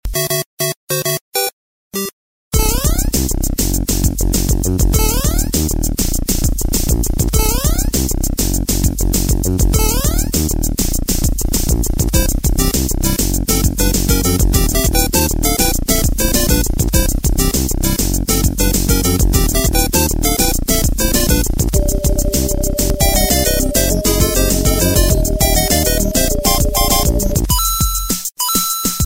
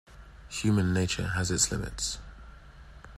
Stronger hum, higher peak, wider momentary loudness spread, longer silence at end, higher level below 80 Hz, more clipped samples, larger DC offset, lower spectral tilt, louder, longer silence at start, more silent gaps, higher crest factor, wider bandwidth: neither; first, 0 dBFS vs -10 dBFS; second, 4 LU vs 13 LU; about the same, 0 s vs 0 s; first, -18 dBFS vs -46 dBFS; neither; first, 0.8% vs under 0.1%; about the same, -4 dB/octave vs -4 dB/octave; first, -15 LUFS vs -29 LUFS; about the same, 0.05 s vs 0.1 s; first, 0.46-0.57 s, 0.76-0.87 s, 1.21-1.32 s, 1.53-1.91 s, 2.13-2.51 s vs none; second, 14 dB vs 20 dB; first, 16.5 kHz vs 14 kHz